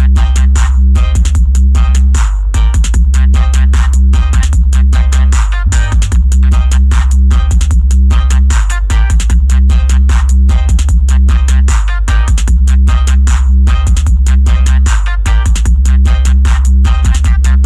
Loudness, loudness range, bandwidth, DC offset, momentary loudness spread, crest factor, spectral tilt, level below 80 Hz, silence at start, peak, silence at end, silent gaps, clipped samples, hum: -10 LUFS; 0 LU; 10.5 kHz; under 0.1%; 2 LU; 4 dB; -5.5 dB/octave; -6 dBFS; 0 s; -2 dBFS; 0 s; none; under 0.1%; none